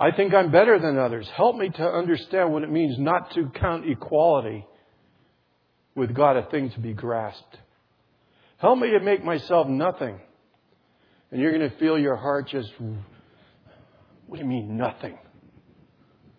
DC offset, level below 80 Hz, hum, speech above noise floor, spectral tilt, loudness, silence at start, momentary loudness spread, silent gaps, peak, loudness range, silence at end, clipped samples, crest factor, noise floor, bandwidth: under 0.1%; -54 dBFS; none; 45 dB; -9.5 dB/octave; -23 LUFS; 0 s; 16 LU; none; -4 dBFS; 7 LU; 1.25 s; under 0.1%; 20 dB; -67 dBFS; 5.4 kHz